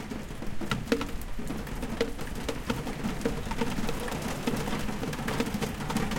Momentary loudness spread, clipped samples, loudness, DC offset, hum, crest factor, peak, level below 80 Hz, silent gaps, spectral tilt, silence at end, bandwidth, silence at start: 6 LU; under 0.1%; -33 LUFS; under 0.1%; none; 22 dB; -10 dBFS; -40 dBFS; none; -5 dB/octave; 0 s; 17 kHz; 0 s